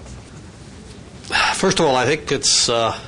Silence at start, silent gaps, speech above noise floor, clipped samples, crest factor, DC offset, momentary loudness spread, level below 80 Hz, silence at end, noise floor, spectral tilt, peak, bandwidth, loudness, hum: 0 s; none; 21 dB; under 0.1%; 16 dB; under 0.1%; 23 LU; -44 dBFS; 0 s; -38 dBFS; -2.5 dB/octave; -4 dBFS; 10.5 kHz; -16 LUFS; none